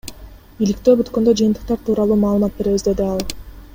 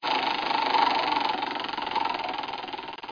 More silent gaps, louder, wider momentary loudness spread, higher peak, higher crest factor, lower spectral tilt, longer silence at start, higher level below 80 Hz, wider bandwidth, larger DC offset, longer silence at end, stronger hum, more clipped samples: neither; first, -17 LUFS vs -27 LUFS; about the same, 9 LU vs 11 LU; first, -2 dBFS vs -10 dBFS; about the same, 16 dB vs 18 dB; first, -6.5 dB/octave vs -3 dB/octave; about the same, 0.05 s vs 0 s; first, -38 dBFS vs -64 dBFS; first, 16.5 kHz vs 5.4 kHz; neither; about the same, 0.1 s vs 0 s; neither; neither